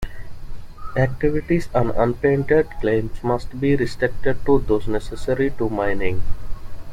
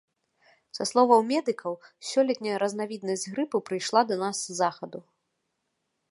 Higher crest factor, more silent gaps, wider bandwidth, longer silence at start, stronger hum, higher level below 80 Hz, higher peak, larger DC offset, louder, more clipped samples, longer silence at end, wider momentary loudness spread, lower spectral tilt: second, 16 dB vs 22 dB; neither; about the same, 10.5 kHz vs 11.5 kHz; second, 0 s vs 0.75 s; neither; first, -30 dBFS vs -82 dBFS; about the same, -4 dBFS vs -6 dBFS; neither; first, -21 LUFS vs -27 LUFS; neither; second, 0 s vs 1.1 s; first, 19 LU vs 16 LU; first, -8 dB/octave vs -3.5 dB/octave